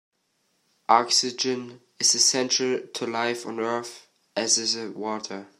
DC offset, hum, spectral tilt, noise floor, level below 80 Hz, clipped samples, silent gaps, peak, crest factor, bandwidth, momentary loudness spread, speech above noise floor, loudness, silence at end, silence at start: under 0.1%; none; -1 dB/octave; -72 dBFS; -82 dBFS; under 0.1%; none; -4 dBFS; 22 dB; 14.5 kHz; 14 LU; 46 dB; -23 LUFS; 0.15 s; 0.9 s